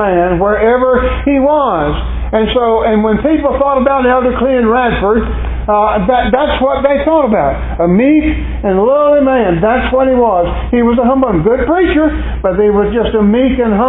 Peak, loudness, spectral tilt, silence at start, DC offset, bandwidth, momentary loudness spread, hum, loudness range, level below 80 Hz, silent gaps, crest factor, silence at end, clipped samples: 0 dBFS; -11 LUFS; -11.5 dB/octave; 0 s; under 0.1%; 4 kHz; 5 LU; none; 1 LU; -22 dBFS; none; 10 dB; 0 s; under 0.1%